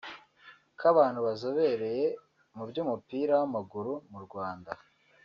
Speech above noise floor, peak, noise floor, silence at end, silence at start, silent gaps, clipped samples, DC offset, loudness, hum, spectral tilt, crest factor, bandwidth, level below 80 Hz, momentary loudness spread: 28 dB; -12 dBFS; -58 dBFS; 0.5 s; 0.05 s; none; under 0.1%; under 0.1%; -30 LUFS; none; -5 dB/octave; 20 dB; 7 kHz; -76 dBFS; 19 LU